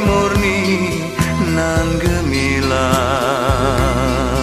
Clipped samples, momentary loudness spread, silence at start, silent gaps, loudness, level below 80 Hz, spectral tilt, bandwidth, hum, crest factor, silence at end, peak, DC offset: under 0.1%; 2 LU; 0 s; none; -16 LUFS; -26 dBFS; -5.5 dB/octave; 15.5 kHz; none; 14 dB; 0 s; -2 dBFS; under 0.1%